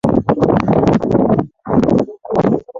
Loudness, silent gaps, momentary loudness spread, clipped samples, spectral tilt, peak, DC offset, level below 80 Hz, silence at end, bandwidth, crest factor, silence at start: -15 LUFS; none; 4 LU; under 0.1%; -9 dB/octave; 0 dBFS; under 0.1%; -38 dBFS; 0 s; 7.6 kHz; 14 dB; 0.05 s